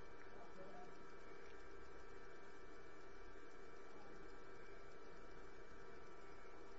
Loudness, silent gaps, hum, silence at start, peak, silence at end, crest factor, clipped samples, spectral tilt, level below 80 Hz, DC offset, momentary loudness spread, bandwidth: -60 LUFS; none; none; 0 s; -42 dBFS; 0 s; 14 dB; under 0.1%; -4 dB/octave; -68 dBFS; 0.3%; 2 LU; 7.6 kHz